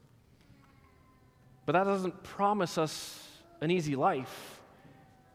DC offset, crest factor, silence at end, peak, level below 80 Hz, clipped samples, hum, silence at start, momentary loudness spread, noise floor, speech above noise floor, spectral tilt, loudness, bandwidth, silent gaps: under 0.1%; 20 dB; 0.75 s; -14 dBFS; -70 dBFS; under 0.1%; none; 1.65 s; 19 LU; -62 dBFS; 31 dB; -5.5 dB/octave; -32 LUFS; 16.5 kHz; none